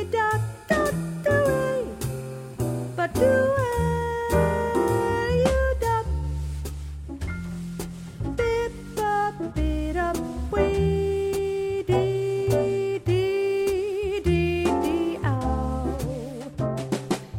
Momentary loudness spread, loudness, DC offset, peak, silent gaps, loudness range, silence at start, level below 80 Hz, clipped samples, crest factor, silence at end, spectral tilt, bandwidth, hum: 10 LU; -25 LUFS; under 0.1%; -8 dBFS; none; 5 LU; 0 s; -36 dBFS; under 0.1%; 16 dB; 0 s; -6.5 dB/octave; 16.5 kHz; none